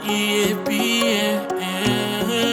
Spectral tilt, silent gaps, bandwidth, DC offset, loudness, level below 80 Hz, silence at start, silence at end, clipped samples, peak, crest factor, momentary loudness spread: -3.5 dB/octave; none; 18.5 kHz; under 0.1%; -20 LUFS; -52 dBFS; 0 s; 0 s; under 0.1%; -4 dBFS; 16 dB; 4 LU